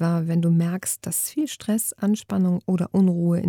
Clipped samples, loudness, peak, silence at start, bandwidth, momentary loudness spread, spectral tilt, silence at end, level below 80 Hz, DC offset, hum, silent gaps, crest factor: under 0.1%; -23 LUFS; -10 dBFS; 0 s; 18 kHz; 5 LU; -6 dB/octave; 0 s; -62 dBFS; under 0.1%; none; none; 12 dB